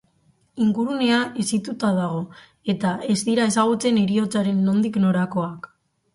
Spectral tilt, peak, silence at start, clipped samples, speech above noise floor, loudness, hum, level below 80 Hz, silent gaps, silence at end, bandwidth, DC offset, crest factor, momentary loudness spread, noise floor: -5.5 dB/octave; -6 dBFS; 0.55 s; under 0.1%; 41 dB; -22 LUFS; none; -62 dBFS; none; 0.5 s; 11.5 kHz; under 0.1%; 16 dB; 10 LU; -62 dBFS